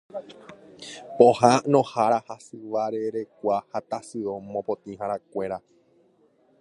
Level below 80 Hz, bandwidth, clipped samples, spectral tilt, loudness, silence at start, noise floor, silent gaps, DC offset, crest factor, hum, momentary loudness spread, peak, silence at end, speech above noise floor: -68 dBFS; 11.5 kHz; under 0.1%; -5.5 dB/octave; -24 LUFS; 0.15 s; -62 dBFS; none; under 0.1%; 24 dB; none; 21 LU; -2 dBFS; 1 s; 37 dB